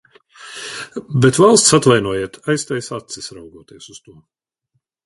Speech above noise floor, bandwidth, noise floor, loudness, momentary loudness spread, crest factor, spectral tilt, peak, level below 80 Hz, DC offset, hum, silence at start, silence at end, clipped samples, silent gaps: 54 dB; 11.5 kHz; -71 dBFS; -14 LUFS; 20 LU; 18 dB; -4 dB/octave; 0 dBFS; -52 dBFS; under 0.1%; none; 0.45 s; 1.1 s; under 0.1%; none